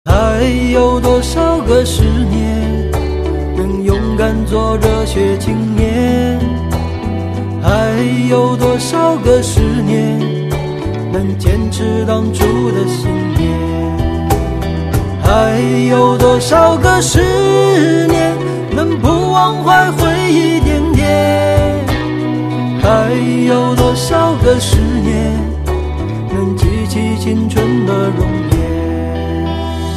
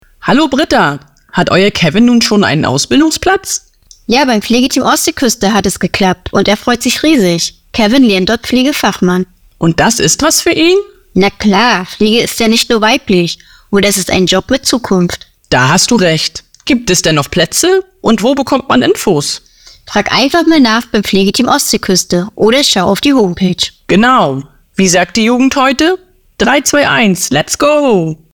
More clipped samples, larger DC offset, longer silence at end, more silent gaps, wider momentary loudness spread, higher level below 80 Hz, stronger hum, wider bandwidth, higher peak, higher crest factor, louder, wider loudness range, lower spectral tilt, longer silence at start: neither; second, under 0.1% vs 0.5%; second, 0 s vs 0.2 s; neither; about the same, 8 LU vs 7 LU; first, -22 dBFS vs -38 dBFS; neither; second, 14 kHz vs over 20 kHz; about the same, 0 dBFS vs 0 dBFS; about the same, 12 dB vs 10 dB; second, -13 LUFS vs -10 LUFS; first, 4 LU vs 1 LU; first, -6 dB/octave vs -3.5 dB/octave; second, 0.05 s vs 0.2 s